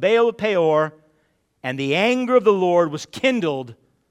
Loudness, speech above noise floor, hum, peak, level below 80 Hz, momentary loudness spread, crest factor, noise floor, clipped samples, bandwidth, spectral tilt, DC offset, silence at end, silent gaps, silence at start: -19 LUFS; 47 dB; none; -4 dBFS; -66 dBFS; 12 LU; 16 dB; -65 dBFS; under 0.1%; 11.5 kHz; -5.5 dB/octave; under 0.1%; 0.35 s; none; 0 s